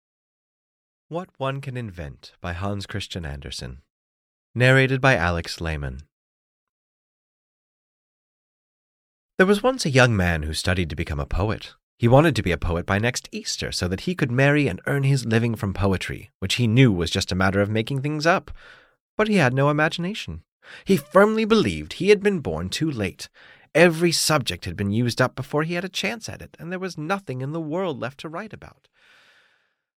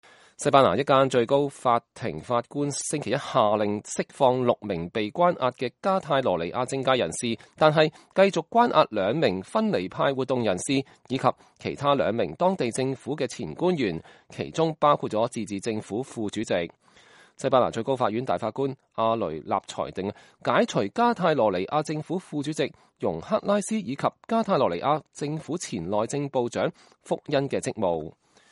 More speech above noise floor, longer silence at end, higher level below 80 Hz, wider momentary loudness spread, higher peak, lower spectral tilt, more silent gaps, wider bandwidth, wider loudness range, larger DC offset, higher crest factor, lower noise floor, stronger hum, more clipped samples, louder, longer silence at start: first, 44 dB vs 30 dB; first, 1.3 s vs 0.4 s; first, -42 dBFS vs -62 dBFS; first, 16 LU vs 10 LU; about the same, -4 dBFS vs -2 dBFS; about the same, -5.5 dB/octave vs -5 dB/octave; first, 3.90-4.54 s, 6.12-9.38 s, 11.83-11.98 s, 16.34-16.40 s, 19.00-19.18 s, 20.48-20.60 s vs none; first, 16 kHz vs 11.5 kHz; first, 10 LU vs 4 LU; neither; about the same, 20 dB vs 22 dB; first, -66 dBFS vs -55 dBFS; neither; neither; first, -22 LUFS vs -26 LUFS; first, 1.1 s vs 0.4 s